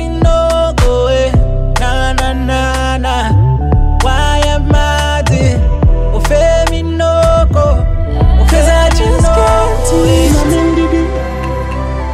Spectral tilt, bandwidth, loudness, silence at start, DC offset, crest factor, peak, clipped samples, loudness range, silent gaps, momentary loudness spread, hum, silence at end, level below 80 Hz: -6 dB/octave; 14 kHz; -12 LUFS; 0 s; under 0.1%; 8 dB; 0 dBFS; under 0.1%; 2 LU; none; 5 LU; none; 0 s; -12 dBFS